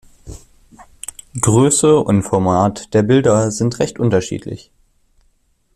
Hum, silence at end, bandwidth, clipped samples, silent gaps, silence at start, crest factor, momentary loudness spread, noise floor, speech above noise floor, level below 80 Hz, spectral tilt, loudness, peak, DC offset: none; 1.2 s; 14 kHz; under 0.1%; none; 0.25 s; 16 dB; 19 LU; -59 dBFS; 45 dB; -44 dBFS; -5.5 dB/octave; -15 LUFS; 0 dBFS; under 0.1%